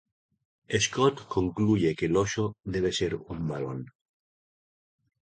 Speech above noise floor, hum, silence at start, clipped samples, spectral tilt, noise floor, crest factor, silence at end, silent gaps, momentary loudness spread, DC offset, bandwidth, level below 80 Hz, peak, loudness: over 63 dB; none; 0.7 s; under 0.1%; -5 dB/octave; under -90 dBFS; 20 dB; 1.35 s; none; 9 LU; under 0.1%; 9.4 kHz; -52 dBFS; -8 dBFS; -28 LUFS